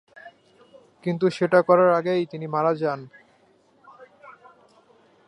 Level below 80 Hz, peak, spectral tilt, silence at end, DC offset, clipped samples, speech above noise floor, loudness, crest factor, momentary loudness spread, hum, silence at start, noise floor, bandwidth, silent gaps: -74 dBFS; -4 dBFS; -7.5 dB/octave; 0.95 s; under 0.1%; under 0.1%; 39 dB; -22 LUFS; 22 dB; 12 LU; none; 0.25 s; -60 dBFS; 11 kHz; none